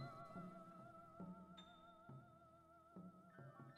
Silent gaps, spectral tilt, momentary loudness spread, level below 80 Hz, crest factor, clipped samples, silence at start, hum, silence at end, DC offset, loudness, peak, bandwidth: none; -7.5 dB/octave; 10 LU; -84 dBFS; 16 dB; under 0.1%; 0 s; none; 0 s; under 0.1%; -60 LUFS; -42 dBFS; 13 kHz